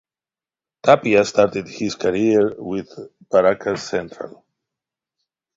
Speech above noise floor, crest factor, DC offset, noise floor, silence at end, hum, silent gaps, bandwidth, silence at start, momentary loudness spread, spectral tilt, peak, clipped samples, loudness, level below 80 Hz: over 71 dB; 20 dB; under 0.1%; under -90 dBFS; 1.3 s; none; none; 7.8 kHz; 0.85 s; 19 LU; -5.5 dB/octave; 0 dBFS; under 0.1%; -19 LUFS; -58 dBFS